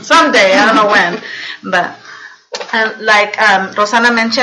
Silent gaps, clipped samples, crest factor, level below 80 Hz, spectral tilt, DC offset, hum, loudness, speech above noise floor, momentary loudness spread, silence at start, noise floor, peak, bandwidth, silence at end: none; under 0.1%; 12 dB; -58 dBFS; -2.5 dB/octave; under 0.1%; none; -10 LUFS; 23 dB; 15 LU; 0 s; -34 dBFS; 0 dBFS; 11.5 kHz; 0 s